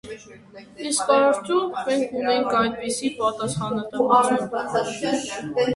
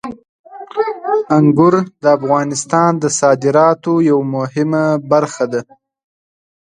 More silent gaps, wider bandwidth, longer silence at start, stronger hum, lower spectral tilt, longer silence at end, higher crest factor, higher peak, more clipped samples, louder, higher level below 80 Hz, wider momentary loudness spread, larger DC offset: second, none vs 0.29-0.44 s; about the same, 11.5 kHz vs 10.5 kHz; about the same, 0.05 s vs 0.05 s; neither; second, -4 dB/octave vs -6 dB/octave; second, 0 s vs 1.05 s; about the same, 18 dB vs 14 dB; second, -6 dBFS vs 0 dBFS; neither; second, -22 LUFS vs -14 LUFS; about the same, -58 dBFS vs -60 dBFS; about the same, 9 LU vs 8 LU; neither